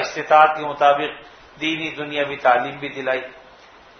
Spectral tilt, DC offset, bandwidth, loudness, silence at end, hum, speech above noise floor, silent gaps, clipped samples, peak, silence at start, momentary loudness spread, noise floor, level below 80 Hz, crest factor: -4 dB/octave; under 0.1%; 6.6 kHz; -19 LUFS; 0.6 s; none; 27 dB; none; under 0.1%; 0 dBFS; 0 s; 13 LU; -47 dBFS; -62 dBFS; 20 dB